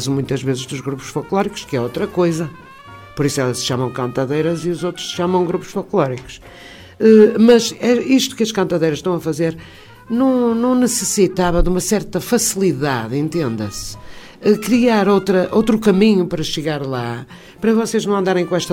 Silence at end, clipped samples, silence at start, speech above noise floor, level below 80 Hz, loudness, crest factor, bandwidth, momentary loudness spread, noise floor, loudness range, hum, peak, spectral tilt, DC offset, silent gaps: 0 s; under 0.1%; 0 s; 22 dB; -36 dBFS; -17 LUFS; 16 dB; 16.5 kHz; 11 LU; -38 dBFS; 6 LU; none; 0 dBFS; -5 dB/octave; under 0.1%; none